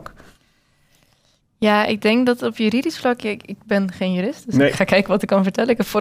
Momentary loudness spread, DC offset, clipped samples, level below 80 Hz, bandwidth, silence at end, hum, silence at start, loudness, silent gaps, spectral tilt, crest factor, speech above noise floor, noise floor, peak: 6 LU; under 0.1%; under 0.1%; -54 dBFS; 16 kHz; 0 s; none; 0 s; -19 LUFS; none; -6 dB/octave; 18 dB; 43 dB; -61 dBFS; -2 dBFS